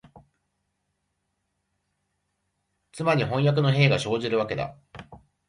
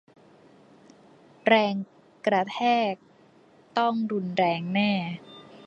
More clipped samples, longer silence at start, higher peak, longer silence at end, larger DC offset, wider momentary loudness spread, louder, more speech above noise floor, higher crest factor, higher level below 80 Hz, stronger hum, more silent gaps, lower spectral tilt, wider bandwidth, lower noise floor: neither; first, 2.95 s vs 1.45 s; about the same, -6 dBFS vs -4 dBFS; first, 0.3 s vs 0 s; neither; second, 10 LU vs 15 LU; about the same, -24 LUFS vs -26 LUFS; first, 54 dB vs 32 dB; about the same, 22 dB vs 22 dB; first, -60 dBFS vs -72 dBFS; neither; neither; about the same, -6.5 dB/octave vs -6.5 dB/octave; first, 11 kHz vs 7.6 kHz; first, -77 dBFS vs -57 dBFS